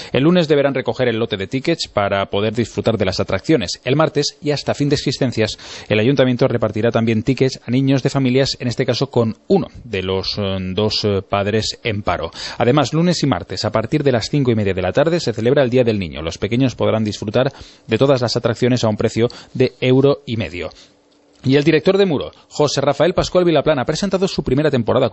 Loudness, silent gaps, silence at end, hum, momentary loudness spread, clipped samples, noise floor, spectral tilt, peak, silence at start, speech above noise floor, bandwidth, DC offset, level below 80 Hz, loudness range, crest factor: -17 LUFS; none; 0 s; none; 7 LU; under 0.1%; -52 dBFS; -6 dB/octave; -2 dBFS; 0 s; 36 dB; 8.4 kHz; under 0.1%; -44 dBFS; 2 LU; 16 dB